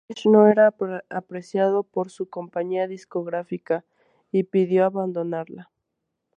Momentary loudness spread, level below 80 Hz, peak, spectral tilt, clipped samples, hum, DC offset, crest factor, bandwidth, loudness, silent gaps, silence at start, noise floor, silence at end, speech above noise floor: 15 LU; -76 dBFS; -4 dBFS; -7.5 dB/octave; under 0.1%; none; under 0.1%; 20 dB; 9.4 kHz; -23 LUFS; none; 0.1 s; -80 dBFS; 0.75 s; 58 dB